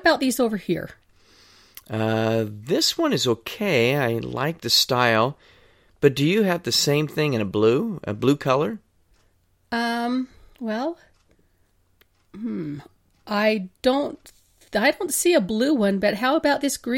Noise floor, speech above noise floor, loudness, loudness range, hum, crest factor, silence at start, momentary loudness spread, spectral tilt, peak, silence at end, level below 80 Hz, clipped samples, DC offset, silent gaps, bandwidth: -63 dBFS; 41 dB; -22 LUFS; 9 LU; none; 20 dB; 0.05 s; 11 LU; -4.5 dB/octave; -4 dBFS; 0 s; -58 dBFS; under 0.1%; under 0.1%; none; 16.5 kHz